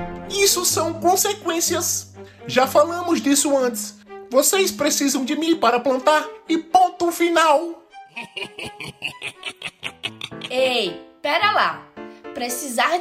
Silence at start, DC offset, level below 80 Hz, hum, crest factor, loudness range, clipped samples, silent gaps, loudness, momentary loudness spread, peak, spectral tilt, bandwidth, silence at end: 0 s; under 0.1%; -58 dBFS; none; 18 dB; 6 LU; under 0.1%; none; -20 LUFS; 15 LU; -4 dBFS; -2 dB/octave; 16 kHz; 0 s